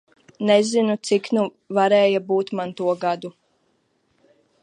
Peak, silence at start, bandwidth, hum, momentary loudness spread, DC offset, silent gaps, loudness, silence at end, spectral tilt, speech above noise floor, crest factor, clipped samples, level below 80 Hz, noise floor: -4 dBFS; 0.4 s; 11 kHz; none; 10 LU; under 0.1%; none; -21 LUFS; 1.3 s; -5 dB/octave; 47 dB; 18 dB; under 0.1%; -74 dBFS; -67 dBFS